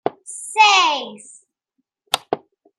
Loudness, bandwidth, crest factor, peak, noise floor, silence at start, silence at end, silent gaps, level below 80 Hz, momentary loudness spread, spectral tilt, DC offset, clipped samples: -17 LUFS; 14.5 kHz; 20 dB; -2 dBFS; -75 dBFS; 0.05 s; 0.45 s; none; -76 dBFS; 18 LU; 0 dB/octave; under 0.1%; under 0.1%